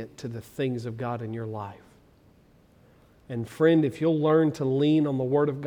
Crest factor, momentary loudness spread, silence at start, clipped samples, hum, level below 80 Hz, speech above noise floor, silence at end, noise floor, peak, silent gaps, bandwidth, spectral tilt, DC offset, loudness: 18 dB; 15 LU; 0 s; under 0.1%; none; -64 dBFS; 33 dB; 0 s; -58 dBFS; -8 dBFS; none; 13 kHz; -8 dB/octave; under 0.1%; -26 LUFS